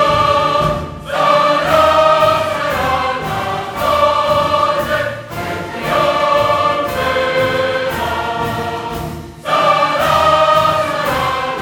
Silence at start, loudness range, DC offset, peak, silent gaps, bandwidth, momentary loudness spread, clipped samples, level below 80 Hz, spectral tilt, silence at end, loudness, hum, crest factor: 0 s; 3 LU; under 0.1%; 0 dBFS; none; 19 kHz; 11 LU; under 0.1%; -38 dBFS; -4.5 dB/octave; 0 s; -14 LUFS; none; 14 dB